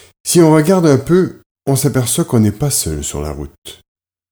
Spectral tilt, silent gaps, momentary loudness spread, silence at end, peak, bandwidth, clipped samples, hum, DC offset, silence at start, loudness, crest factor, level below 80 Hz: -5.5 dB/octave; 1.46-1.55 s, 3.58-3.62 s; 15 LU; 0.6 s; 0 dBFS; over 20 kHz; under 0.1%; none; under 0.1%; 0.25 s; -13 LUFS; 14 dB; -36 dBFS